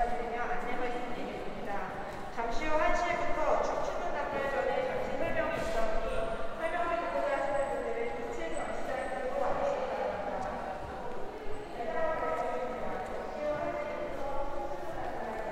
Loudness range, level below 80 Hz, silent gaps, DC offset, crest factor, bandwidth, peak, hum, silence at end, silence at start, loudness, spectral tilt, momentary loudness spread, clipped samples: 4 LU; -44 dBFS; none; under 0.1%; 16 dB; 10.5 kHz; -16 dBFS; none; 0 s; 0 s; -34 LUFS; -5 dB/octave; 8 LU; under 0.1%